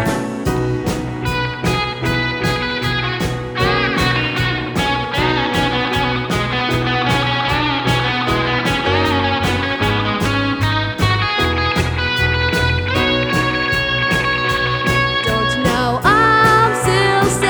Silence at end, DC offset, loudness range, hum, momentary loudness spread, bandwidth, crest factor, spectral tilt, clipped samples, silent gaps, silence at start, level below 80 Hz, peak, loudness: 0 s; under 0.1%; 3 LU; none; 5 LU; over 20 kHz; 16 dB; -5 dB/octave; under 0.1%; none; 0 s; -32 dBFS; 0 dBFS; -16 LUFS